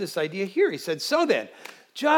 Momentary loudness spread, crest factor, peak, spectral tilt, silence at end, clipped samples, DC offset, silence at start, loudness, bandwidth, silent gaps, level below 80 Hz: 18 LU; 16 dB; -8 dBFS; -4 dB/octave; 0 s; under 0.1%; under 0.1%; 0 s; -25 LUFS; 18.5 kHz; none; under -90 dBFS